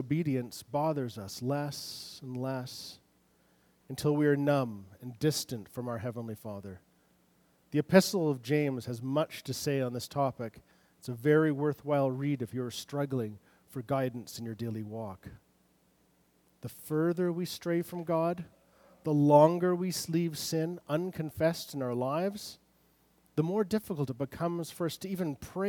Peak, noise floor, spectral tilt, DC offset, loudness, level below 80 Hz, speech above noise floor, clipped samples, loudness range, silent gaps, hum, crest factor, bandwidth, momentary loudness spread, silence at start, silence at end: -8 dBFS; -69 dBFS; -6 dB/octave; under 0.1%; -32 LUFS; -68 dBFS; 37 dB; under 0.1%; 8 LU; none; none; 24 dB; 19.5 kHz; 16 LU; 0 s; 0 s